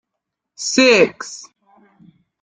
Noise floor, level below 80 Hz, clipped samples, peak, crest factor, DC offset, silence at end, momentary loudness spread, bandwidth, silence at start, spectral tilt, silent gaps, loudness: -80 dBFS; -62 dBFS; under 0.1%; -2 dBFS; 18 dB; under 0.1%; 1 s; 20 LU; 9.6 kHz; 0.6 s; -2.5 dB/octave; none; -14 LUFS